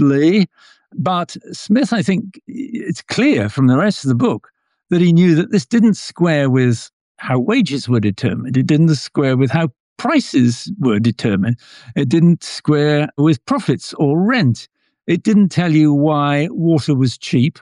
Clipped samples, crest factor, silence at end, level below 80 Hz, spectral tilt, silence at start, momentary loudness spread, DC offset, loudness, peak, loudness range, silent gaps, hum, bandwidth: under 0.1%; 12 dB; 0.1 s; -58 dBFS; -7 dB/octave; 0 s; 10 LU; under 0.1%; -16 LUFS; -4 dBFS; 2 LU; 6.93-7.15 s, 9.80-9.96 s; none; 11 kHz